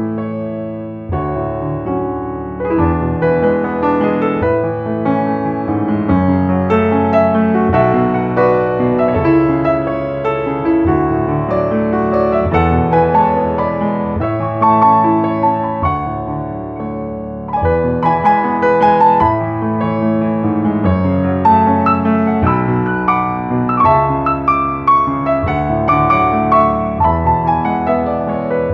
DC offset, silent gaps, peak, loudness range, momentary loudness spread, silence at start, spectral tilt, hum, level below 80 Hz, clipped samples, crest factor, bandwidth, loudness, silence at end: under 0.1%; none; 0 dBFS; 3 LU; 8 LU; 0 s; -10 dB/octave; none; -34 dBFS; under 0.1%; 14 dB; 5.8 kHz; -14 LUFS; 0 s